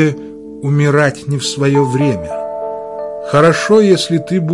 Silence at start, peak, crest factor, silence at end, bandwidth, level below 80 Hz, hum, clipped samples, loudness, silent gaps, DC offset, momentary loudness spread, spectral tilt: 0 s; 0 dBFS; 14 dB; 0 s; 11.5 kHz; -50 dBFS; none; under 0.1%; -14 LUFS; none; under 0.1%; 14 LU; -6 dB/octave